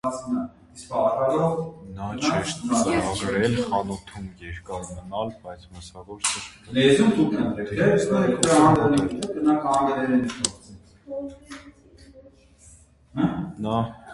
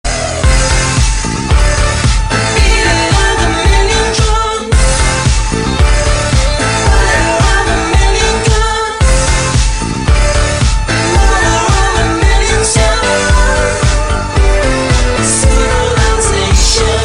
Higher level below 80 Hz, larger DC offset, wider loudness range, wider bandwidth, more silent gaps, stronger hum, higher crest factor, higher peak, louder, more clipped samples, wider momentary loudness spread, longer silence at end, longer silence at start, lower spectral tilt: second, -50 dBFS vs -12 dBFS; second, under 0.1% vs 1%; first, 11 LU vs 1 LU; about the same, 11.5 kHz vs 11 kHz; neither; neither; first, 22 dB vs 10 dB; about the same, -2 dBFS vs 0 dBFS; second, -23 LUFS vs -11 LUFS; neither; first, 19 LU vs 3 LU; about the same, 0 s vs 0 s; about the same, 0.05 s vs 0.05 s; about the same, -5 dB/octave vs -4 dB/octave